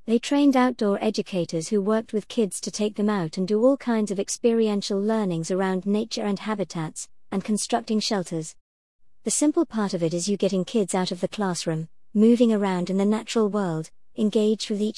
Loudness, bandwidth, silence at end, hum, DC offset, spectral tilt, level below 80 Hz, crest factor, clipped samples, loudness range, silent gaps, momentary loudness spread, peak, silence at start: -24 LUFS; 12 kHz; 0 s; none; 0.3%; -5 dB/octave; -64 dBFS; 16 dB; under 0.1%; 3 LU; 8.61-8.99 s; 9 LU; -8 dBFS; 0.05 s